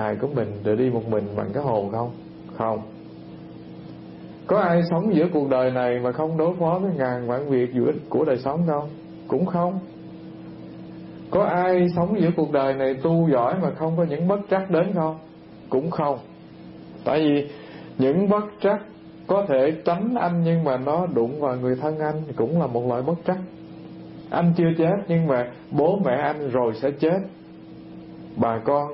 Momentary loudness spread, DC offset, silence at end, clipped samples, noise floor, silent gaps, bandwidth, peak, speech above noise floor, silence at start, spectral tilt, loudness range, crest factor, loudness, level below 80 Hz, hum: 20 LU; under 0.1%; 0 s; under 0.1%; -42 dBFS; none; 5.6 kHz; -8 dBFS; 20 dB; 0 s; -12.5 dB/octave; 4 LU; 16 dB; -23 LUFS; -58 dBFS; none